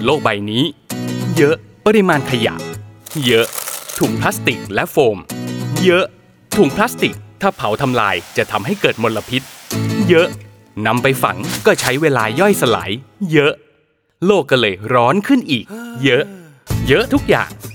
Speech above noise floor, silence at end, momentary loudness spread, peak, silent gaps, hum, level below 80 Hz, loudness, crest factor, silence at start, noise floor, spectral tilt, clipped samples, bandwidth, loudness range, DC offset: 43 dB; 0 s; 10 LU; 0 dBFS; none; none; -44 dBFS; -16 LUFS; 16 dB; 0 s; -58 dBFS; -5 dB/octave; under 0.1%; over 20 kHz; 2 LU; under 0.1%